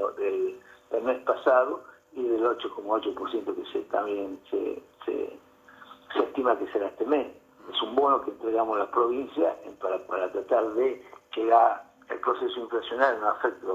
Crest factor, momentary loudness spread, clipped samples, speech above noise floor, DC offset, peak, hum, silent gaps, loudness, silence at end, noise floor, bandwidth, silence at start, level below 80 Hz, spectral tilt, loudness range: 20 dB; 11 LU; under 0.1%; 26 dB; under 0.1%; -8 dBFS; none; none; -28 LUFS; 0 s; -53 dBFS; 14 kHz; 0 s; -70 dBFS; -5 dB/octave; 5 LU